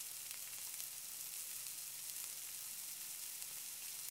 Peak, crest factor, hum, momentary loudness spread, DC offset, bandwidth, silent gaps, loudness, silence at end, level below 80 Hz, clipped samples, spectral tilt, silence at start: -22 dBFS; 26 dB; none; 1 LU; under 0.1%; 18 kHz; none; -45 LUFS; 0 s; under -90 dBFS; under 0.1%; 2 dB/octave; 0 s